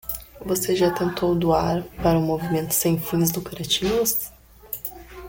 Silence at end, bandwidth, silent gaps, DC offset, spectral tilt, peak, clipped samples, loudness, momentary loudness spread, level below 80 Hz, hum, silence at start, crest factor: 0 s; 17 kHz; none; under 0.1%; -4.5 dB/octave; -8 dBFS; under 0.1%; -23 LUFS; 11 LU; -44 dBFS; none; 0.05 s; 16 dB